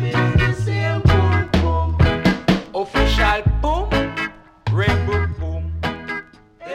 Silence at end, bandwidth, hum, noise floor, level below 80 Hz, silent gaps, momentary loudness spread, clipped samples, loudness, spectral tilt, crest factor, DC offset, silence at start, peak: 0 s; 11 kHz; none; -40 dBFS; -26 dBFS; none; 10 LU; under 0.1%; -19 LUFS; -6.5 dB/octave; 16 dB; under 0.1%; 0 s; -2 dBFS